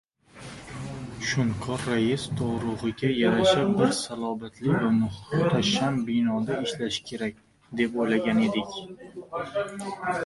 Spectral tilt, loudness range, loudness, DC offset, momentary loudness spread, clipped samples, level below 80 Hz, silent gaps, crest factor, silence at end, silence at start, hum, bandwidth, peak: -5.5 dB/octave; 4 LU; -26 LUFS; under 0.1%; 14 LU; under 0.1%; -54 dBFS; none; 18 dB; 0 s; 0.35 s; none; 11.5 kHz; -8 dBFS